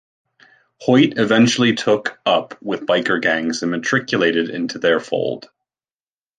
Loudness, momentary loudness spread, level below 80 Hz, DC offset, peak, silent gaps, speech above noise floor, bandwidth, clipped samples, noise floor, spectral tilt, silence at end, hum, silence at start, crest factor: -18 LUFS; 9 LU; -64 dBFS; under 0.1%; -2 dBFS; none; over 72 dB; 9.4 kHz; under 0.1%; under -90 dBFS; -4.5 dB/octave; 1 s; none; 0.8 s; 16 dB